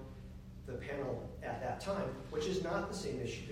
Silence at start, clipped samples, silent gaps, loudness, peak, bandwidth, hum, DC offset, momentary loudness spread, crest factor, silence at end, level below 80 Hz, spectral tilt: 0 s; under 0.1%; none; -40 LUFS; -24 dBFS; 16 kHz; none; under 0.1%; 13 LU; 16 dB; 0 s; -54 dBFS; -5.5 dB/octave